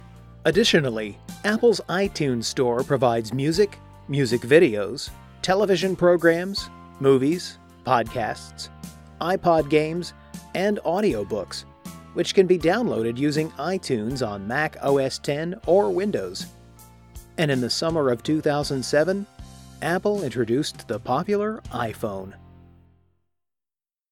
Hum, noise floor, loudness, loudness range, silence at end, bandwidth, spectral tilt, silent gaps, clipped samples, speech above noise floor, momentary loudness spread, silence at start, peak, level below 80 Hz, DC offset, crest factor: none; under -90 dBFS; -23 LUFS; 4 LU; 1.75 s; 16.5 kHz; -5 dB/octave; none; under 0.1%; over 68 dB; 15 LU; 0.05 s; -4 dBFS; -50 dBFS; under 0.1%; 20 dB